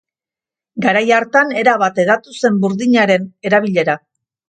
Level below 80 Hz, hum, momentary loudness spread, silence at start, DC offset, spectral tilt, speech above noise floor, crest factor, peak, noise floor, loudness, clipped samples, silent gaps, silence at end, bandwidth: -64 dBFS; none; 6 LU; 0.75 s; under 0.1%; -5.5 dB/octave; 75 dB; 16 dB; 0 dBFS; -89 dBFS; -14 LUFS; under 0.1%; none; 0.5 s; 9.2 kHz